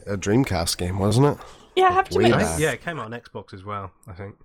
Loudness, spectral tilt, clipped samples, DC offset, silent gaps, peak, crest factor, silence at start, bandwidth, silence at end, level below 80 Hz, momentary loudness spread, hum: -21 LUFS; -5 dB/octave; under 0.1%; under 0.1%; none; -6 dBFS; 16 dB; 0.05 s; 19.5 kHz; 0.15 s; -44 dBFS; 19 LU; none